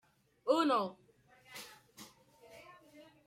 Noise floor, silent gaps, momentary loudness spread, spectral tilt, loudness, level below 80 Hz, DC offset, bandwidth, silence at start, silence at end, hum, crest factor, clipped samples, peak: -63 dBFS; none; 27 LU; -4.5 dB/octave; -34 LUFS; -84 dBFS; under 0.1%; 16 kHz; 0.45 s; 0.25 s; none; 22 dB; under 0.1%; -18 dBFS